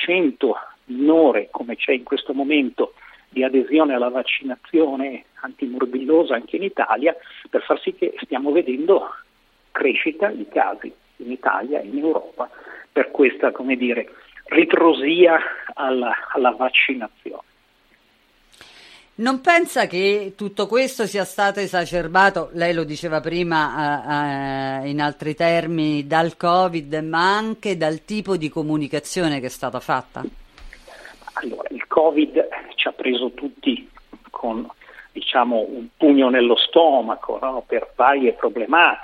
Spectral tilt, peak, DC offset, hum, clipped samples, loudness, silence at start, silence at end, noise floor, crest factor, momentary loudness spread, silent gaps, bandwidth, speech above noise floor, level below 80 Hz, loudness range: -5 dB/octave; -2 dBFS; under 0.1%; none; under 0.1%; -20 LUFS; 0 s; 0 s; -59 dBFS; 18 dB; 14 LU; none; 14.5 kHz; 39 dB; -54 dBFS; 5 LU